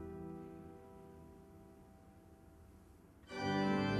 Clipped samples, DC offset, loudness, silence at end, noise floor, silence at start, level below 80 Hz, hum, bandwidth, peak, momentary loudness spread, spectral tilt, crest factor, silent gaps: under 0.1%; under 0.1%; -41 LUFS; 0 s; -62 dBFS; 0 s; -66 dBFS; none; 13 kHz; -24 dBFS; 25 LU; -6.5 dB/octave; 20 dB; none